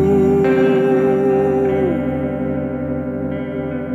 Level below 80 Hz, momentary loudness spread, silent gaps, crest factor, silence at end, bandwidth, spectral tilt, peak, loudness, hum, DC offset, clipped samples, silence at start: -40 dBFS; 9 LU; none; 12 dB; 0 s; 7.4 kHz; -9 dB/octave; -4 dBFS; -17 LUFS; none; under 0.1%; under 0.1%; 0 s